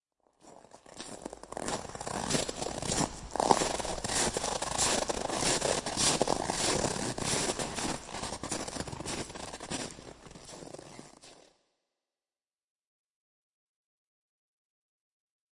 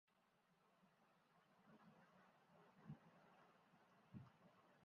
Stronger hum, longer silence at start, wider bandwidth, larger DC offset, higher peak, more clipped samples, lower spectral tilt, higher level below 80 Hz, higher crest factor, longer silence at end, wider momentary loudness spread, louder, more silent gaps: neither; first, 0.45 s vs 0.05 s; first, 11.5 kHz vs 6 kHz; neither; first, -6 dBFS vs -46 dBFS; neither; second, -2.5 dB/octave vs -6 dB/octave; first, -54 dBFS vs under -90 dBFS; first, 30 dB vs 24 dB; first, 4.2 s vs 0 s; first, 19 LU vs 5 LU; first, -31 LUFS vs -65 LUFS; neither